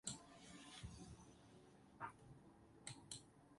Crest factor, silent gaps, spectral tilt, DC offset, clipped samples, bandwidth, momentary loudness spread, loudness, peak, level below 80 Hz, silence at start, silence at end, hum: 28 dB; none; -3 dB/octave; under 0.1%; under 0.1%; 11.5 kHz; 12 LU; -58 LUFS; -30 dBFS; -72 dBFS; 0.05 s; 0 s; none